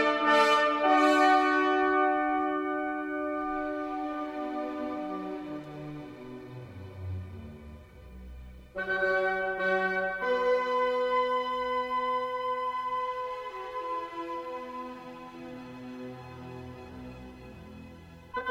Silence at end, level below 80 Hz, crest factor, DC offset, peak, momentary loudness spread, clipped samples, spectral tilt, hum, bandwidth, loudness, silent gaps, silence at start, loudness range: 0 s; -58 dBFS; 20 dB; under 0.1%; -10 dBFS; 22 LU; under 0.1%; -5 dB/octave; none; 14.5 kHz; -29 LUFS; none; 0 s; 16 LU